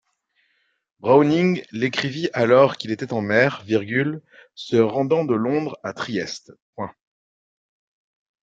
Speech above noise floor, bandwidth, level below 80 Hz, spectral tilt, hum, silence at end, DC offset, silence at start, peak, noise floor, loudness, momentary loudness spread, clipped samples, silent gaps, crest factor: 48 dB; 7.8 kHz; -66 dBFS; -6.5 dB/octave; none; 1.5 s; under 0.1%; 1.05 s; -2 dBFS; -68 dBFS; -21 LUFS; 18 LU; under 0.1%; 6.62-6.73 s; 20 dB